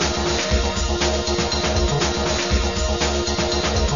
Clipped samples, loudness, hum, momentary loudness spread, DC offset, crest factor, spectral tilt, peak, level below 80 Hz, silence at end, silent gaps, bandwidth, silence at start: under 0.1%; -20 LUFS; none; 1 LU; 0.7%; 14 dB; -4 dB/octave; -6 dBFS; -26 dBFS; 0 s; none; 7.4 kHz; 0 s